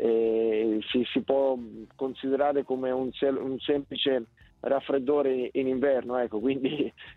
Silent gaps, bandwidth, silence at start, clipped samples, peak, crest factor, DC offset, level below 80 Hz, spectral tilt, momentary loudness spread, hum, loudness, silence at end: none; 4.2 kHz; 0 s; under 0.1%; -10 dBFS; 16 dB; under 0.1%; -64 dBFS; -8 dB/octave; 7 LU; none; -28 LUFS; 0.05 s